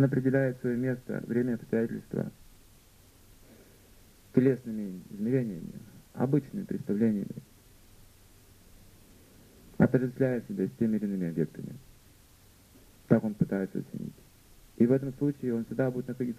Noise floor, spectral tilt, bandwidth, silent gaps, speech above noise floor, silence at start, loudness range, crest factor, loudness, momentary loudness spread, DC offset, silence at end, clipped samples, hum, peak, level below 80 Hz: -58 dBFS; -9 dB/octave; 15 kHz; none; 29 dB; 0 s; 4 LU; 24 dB; -30 LUFS; 15 LU; under 0.1%; 0 s; under 0.1%; none; -6 dBFS; -60 dBFS